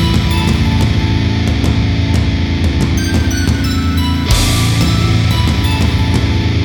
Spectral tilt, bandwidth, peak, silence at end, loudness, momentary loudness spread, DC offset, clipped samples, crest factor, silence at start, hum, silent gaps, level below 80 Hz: -5.5 dB/octave; 18.5 kHz; 0 dBFS; 0 s; -13 LUFS; 2 LU; under 0.1%; under 0.1%; 12 dB; 0 s; none; none; -18 dBFS